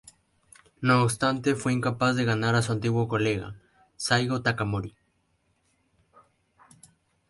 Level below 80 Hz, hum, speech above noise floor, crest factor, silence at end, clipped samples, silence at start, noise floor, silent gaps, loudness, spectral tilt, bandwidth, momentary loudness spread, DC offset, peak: -56 dBFS; none; 46 dB; 20 dB; 2.4 s; under 0.1%; 0.8 s; -71 dBFS; none; -26 LUFS; -5.5 dB/octave; 11.5 kHz; 10 LU; under 0.1%; -8 dBFS